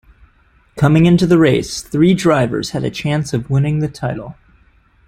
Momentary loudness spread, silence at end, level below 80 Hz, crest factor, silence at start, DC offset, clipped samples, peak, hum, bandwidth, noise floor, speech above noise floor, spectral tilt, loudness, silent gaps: 11 LU; 0.75 s; -42 dBFS; 14 dB; 0.75 s; under 0.1%; under 0.1%; -2 dBFS; none; 14 kHz; -53 dBFS; 39 dB; -6.5 dB/octave; -15 LUFS; none